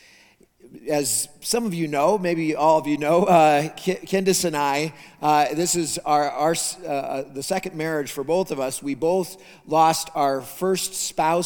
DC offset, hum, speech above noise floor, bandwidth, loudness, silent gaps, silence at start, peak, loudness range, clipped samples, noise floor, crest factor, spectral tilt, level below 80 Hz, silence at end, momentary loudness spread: under 0.1%; none; 33 dB; 19.5 kHz; -22 LUFS; none; 0.65 s; -2 dBFS; 4 LU; under 0.1%; -55 dBFS; 20 dB; -4 dB/octave; -60 dBFS; 0 s; 8 LU